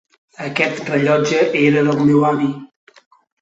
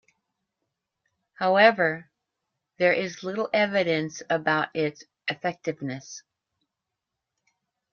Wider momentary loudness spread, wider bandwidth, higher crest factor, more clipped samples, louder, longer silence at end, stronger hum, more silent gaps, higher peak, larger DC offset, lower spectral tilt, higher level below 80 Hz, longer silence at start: second, 10 LU vs 16 LU; first, 8 kHz vs 7 kHz; second, 16 dB vs 22 dB; neither; first, -16 LUFS vs -25 LUFS; second, 0.75 s vs 1.75 s; neither; neither; first, -2 dBFS vs -6 dBFS; neither; first, -6 dB/octave vs -4.5 dB/octave; first, -60 dBFS vs -74 dBFS; second, 0.4 s vs 1.4 s